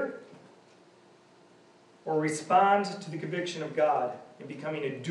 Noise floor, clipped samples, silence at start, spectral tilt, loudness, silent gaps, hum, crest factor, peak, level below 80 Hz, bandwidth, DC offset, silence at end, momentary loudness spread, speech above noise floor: -58 dBFS; under 0.1%; 0 s; -5 dB/octave; -29 LUFS; none; none; 20 dB; -12 dBFS; -90 dBFS; 11.5 kHz; under 0.1%; 0 s; 19 LU; 30 dB